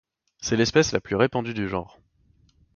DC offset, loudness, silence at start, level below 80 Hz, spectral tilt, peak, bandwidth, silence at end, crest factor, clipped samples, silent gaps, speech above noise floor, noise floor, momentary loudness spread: under 0.1%; -24 LUFS; 0.4 s; -50 dBFS; -4.5 dB/octave; -6 dBFS; 7.2 kHz; 0.9 s; 20 dB; under 0.1%; none; 38 dB; -62 dBFS; 11 LU